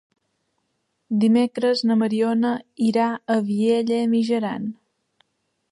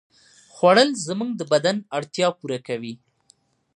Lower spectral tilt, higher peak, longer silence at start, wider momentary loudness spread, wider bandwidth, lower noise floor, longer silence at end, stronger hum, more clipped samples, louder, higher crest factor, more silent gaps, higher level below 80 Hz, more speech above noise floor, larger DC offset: first, -6.5 dB/octave vs -4 dB/octave; second, -8 dBFS vs -2 dBFS; first, 1.1 s vs 0.55 s; second, 6 LU vs 15 LU; about the same, 11 kHz vs 11 kHz; first, -74 dBFS vs -61 dBFS; first, 1 s vs 0.8 s; neither; neither; about the same, -21 LUFS vs -22 LUFS; second, 14 dB vs 20 dB; neither; about the same, -72 dBFS vs -74 dBFS; first, 53 dB vs 40 dB; neither